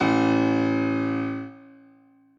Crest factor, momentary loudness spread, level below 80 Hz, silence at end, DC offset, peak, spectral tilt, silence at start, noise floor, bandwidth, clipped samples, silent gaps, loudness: 14 dB; 13 LU; -64 dBFS; 0.8 s; under 0.1%; -10 dBFS; -7 dB/octave; 0 s; -56 dBFS; 7.2 kHz; under 0.1%; none; -24 LUFS